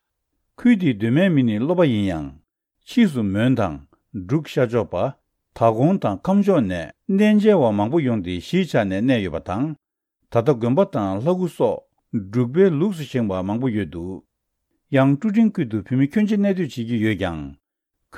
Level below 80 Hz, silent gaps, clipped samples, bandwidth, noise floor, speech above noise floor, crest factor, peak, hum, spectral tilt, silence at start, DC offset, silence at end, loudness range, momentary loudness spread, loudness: -54 dBFS; none; under 0.1%; 12.5 kHz; -78 dBFS; 59 dB; 16 dB; -4 dBFS; none; -8 dB/octave; 0.6 s; under 0.1%; 0 s; 4 LU; 11 LU; -20 LUFS